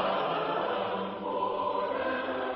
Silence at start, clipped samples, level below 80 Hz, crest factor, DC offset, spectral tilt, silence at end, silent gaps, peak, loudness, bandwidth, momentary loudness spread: 0 s; under 0.1%; -66 dBFS; 14 dB; under 0.1%; -2.5 dB/octave; 0 s; none; -16 dBFS; -31 LUFS; 5.6 kHz; 3 LU